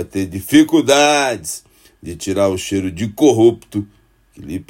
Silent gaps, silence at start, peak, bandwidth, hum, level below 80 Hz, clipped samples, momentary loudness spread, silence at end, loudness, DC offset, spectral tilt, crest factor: none; 0 s; 0 dBFS; 16.5 kHz; none; -50 dBFS; under 0.1%; 18 LU; 0.1 s; -15 LUFS; under 0.1%; -4.5 dB/octave; 16 dB